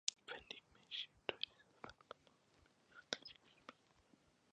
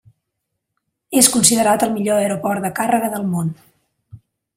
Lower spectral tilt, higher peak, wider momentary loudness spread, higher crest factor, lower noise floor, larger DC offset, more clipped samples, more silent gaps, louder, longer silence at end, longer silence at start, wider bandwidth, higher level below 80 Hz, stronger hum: second, 0 dB/octave vs -3.5 dB/octave; second, -14 dBFS vs 0 dBFS; first, 16 LU vs 10 LU; first, 40 dB vs 20 dB; about the same, -74 dBFS vs -77 dBFS; neither; neither; neither; second, -50 LUFS vs -16 LUFS; first, 0.8 s vs 0.4 s; second, 0.05 s vs 1.1 s; second, 9.6 kHz vs 16.5 kHz; second, -82 dBFS vs -58 dBFS; neither